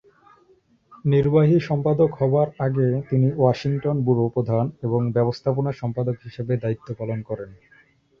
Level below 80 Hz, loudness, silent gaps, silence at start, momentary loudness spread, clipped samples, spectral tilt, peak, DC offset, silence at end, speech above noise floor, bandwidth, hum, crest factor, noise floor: -54 dBFS; -22 LUFS; none; 0.9 s; 11 LU; under 0.1%; -9.5 dB/octave; -4 dBFS; under 0.1%; 0.65 s; 38 dB; 6.6 kHz; none; 18 dB; -59 dBFS